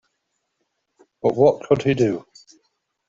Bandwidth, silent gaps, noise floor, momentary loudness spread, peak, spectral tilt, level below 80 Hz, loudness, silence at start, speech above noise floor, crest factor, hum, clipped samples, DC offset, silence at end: 7.6 kHz; none; -75 dBFS; 7 LU; -4 dBFS; -7.5 dB/octave; -58 dBFS; -20 LUFS; 1.25 s; 57 dB; 20 dB; none; under 0.1%; under 0.1%; 0.9 s